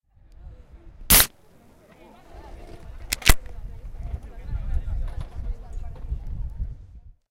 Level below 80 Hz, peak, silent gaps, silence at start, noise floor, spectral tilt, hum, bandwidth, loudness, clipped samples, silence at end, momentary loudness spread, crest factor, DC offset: -30 dBFS; 0 dBFS; none; 0.4 s; -53 dBFS; -2 dB/octave; none; 16 kHz; -23 LUFS; under 0.1%; 0.2 s; 29 LU; 26 dB; under 0.1%